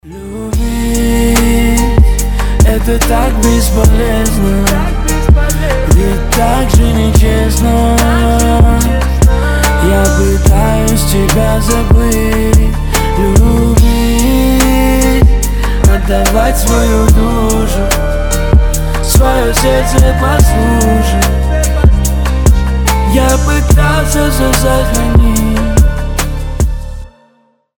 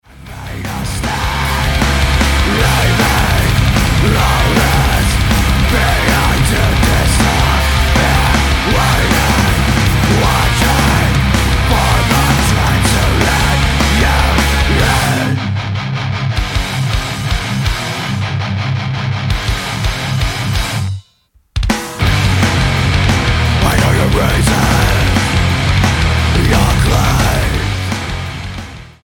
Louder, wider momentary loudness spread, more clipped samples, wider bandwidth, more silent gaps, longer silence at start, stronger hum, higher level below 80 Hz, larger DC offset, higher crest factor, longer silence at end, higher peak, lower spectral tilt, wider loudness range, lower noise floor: first, -10 LUFS vs -13 LUFS; about the same, 5 LU vs 7 LU; neither; first, over 20 kHz vs 17.5 kHz; neither; about the same, 0.05 s vs 0.15 s; neither; first, -10 dBFS vs -18 dBFS; neither; about the same, 8 dB vs 12 dB; first, 0.7 s vs 0.15 s; about the same, 0 dBFS vs 0 dBFS; about the same, -5.5 dB/octave vs -4.5 dB/octave; second, 1 LU vs 5 LU; about the same, -52 dBFS vs -53 dBFS